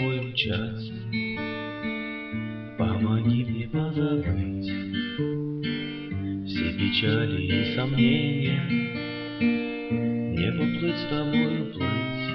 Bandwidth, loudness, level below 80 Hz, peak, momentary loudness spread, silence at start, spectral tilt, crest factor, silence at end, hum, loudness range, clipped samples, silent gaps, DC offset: 5.8 kHz; -27 LUFS; -50 dBFS; -10 dBFS; 9 LU; 0 s; -9 dB/octave; 16 dB; 0 s; none; 3 LU; under 0.1%; none; under 0.1%